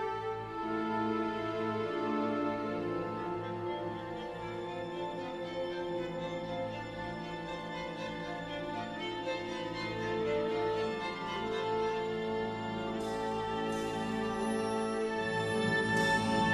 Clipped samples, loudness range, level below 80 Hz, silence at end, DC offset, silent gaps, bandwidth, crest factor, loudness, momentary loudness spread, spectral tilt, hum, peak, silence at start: under 0.1%; 5 LU; -60 dBFS; 0 s; under 0.1%; none; 13 kHz; 16 dB; -35 LUFS; 7 LU; -5.5 dB/octave; none; -18 dBFS; 0 s